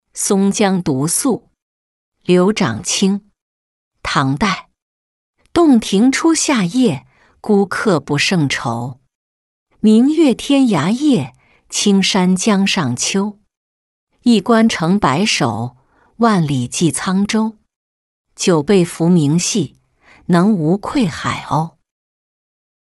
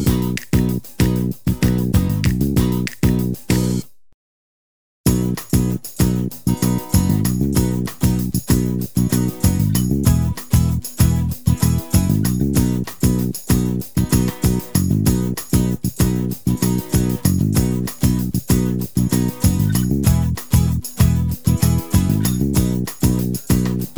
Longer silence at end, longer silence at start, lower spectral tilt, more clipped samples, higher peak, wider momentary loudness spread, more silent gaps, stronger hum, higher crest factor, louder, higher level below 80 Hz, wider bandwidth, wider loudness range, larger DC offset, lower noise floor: first, 1.15 s vs 0.05 s; first, 0.15 s vs 0 s; about the same, -5 dB/octave vs -6 dB/octave; neither; about the same, -2 dBFS vs 0 dBFS; first, 10 LU vs 4 LU; first, 1.62-2.12 s, 3.42-3.91 s, 4.82-5.34 s, 9.15-9.66 s, 13.57-14.07 s, 17.76-18.25 s vs 4.14-5.04 s; neither; about the same, 14 dB vs 18 dB; first, -15 LUFS vs -19 LUFS; second, -48 dBFS vs -28 dBFS; second, 12 kHz vs over 20 kHz; about the same, 3 LU vs 3 LU; second, under 0.1% vs 1%; second, -50 dBFS vs under -90 dBFS